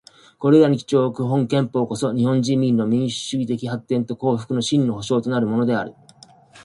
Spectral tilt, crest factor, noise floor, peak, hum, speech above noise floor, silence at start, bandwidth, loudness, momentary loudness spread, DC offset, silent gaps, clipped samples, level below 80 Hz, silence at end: -6.5 dB/octave; 18 dB; -49 dBFS; -2 dBFS; none; 30 dB; 0.4 s; 11.5 kHz; -20 LUFS; 8 LU; under 0.1%; none; under 0.1%; -60 dBFS; 0 s